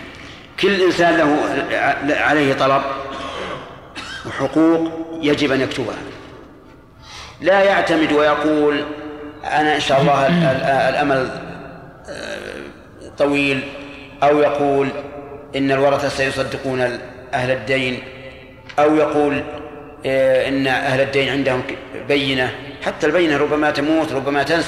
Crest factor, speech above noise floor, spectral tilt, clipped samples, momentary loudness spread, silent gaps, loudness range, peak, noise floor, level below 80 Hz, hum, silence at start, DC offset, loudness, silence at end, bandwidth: 14 dB; 26 dB; -5.5 dB/octave; under 0.1%; 18 LU; none; 4 LU; -4 dBFS; -43 dBFS; -48 dBFS; none; 0 s; under 0.1%; -17 LUFS; 0 s; 13 kHz